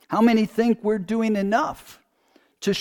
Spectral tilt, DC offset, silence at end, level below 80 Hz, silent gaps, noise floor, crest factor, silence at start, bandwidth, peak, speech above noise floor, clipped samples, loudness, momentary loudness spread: -6 dB/octave; under 0.1%; 0 s; -58 dBFS; none; -61 dBFS; 16 dB; 0.1 s; 17.5 kHz; -8 dBFS; 40 dB; under 0.1%; -22 LUFS; 10 LU